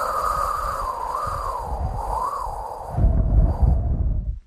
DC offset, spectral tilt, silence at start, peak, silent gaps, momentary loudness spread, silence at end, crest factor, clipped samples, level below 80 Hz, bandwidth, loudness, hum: under 0.1%; -7 dB/octave; 0 s; -6 dBFS; none; 8 LU; 0.05 s; 16 dB; under 0.1%; -24 dBFS; 14.5 kHz; -24 LUFS; none